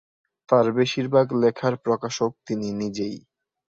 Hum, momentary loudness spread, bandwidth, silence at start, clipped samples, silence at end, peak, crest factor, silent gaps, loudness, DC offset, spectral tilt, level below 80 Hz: none; 10 LU; 7.8 kHz; 0.5 s; under 0.1%; 0.6 s; -4 dBFS; 20 dB; none; -23 LUFS; under 0.1%; -6 dB/octave; -64 dBFS